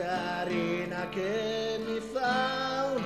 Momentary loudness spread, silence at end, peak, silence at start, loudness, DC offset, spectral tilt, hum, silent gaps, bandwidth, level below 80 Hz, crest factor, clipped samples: 5 LU; 0 s; -16 dBFS; 0 s; -31 LUFS; under 0.1%; -5 dB/octave; none; none; 13.5 kHz; -60 dBFS; 14 dB; under 0.1%